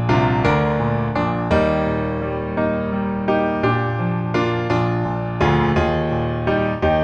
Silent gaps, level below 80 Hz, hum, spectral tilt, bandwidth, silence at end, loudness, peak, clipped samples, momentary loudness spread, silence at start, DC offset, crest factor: none; -34 dBFS; none; -8 dB/octave; 7.4 kHz; 0 s; -20 LUFS; -2 dBFS; under 0.1%; 5 LU; 0 s; under 0.1%; 16 dB